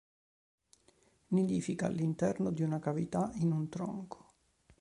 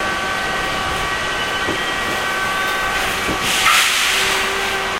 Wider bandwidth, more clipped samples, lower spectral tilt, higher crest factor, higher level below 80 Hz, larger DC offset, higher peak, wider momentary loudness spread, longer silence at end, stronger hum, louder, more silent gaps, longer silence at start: second, 11 kHz vs 16 kHz; neither; first, -8 dB/octave vs -1 dB/octave; about the same, 18 dB vs 18 dB; second, -66 dBFS vs -38 dBFS; neither; second, -18 dBFS vs 0 dBFS; about the same, 8 LU vs 7 LU; first, 0.65 s vs 0 s; neither; second, -35 LUFS vs -17 LUFS; neither; first, 1.3 s vs 0 s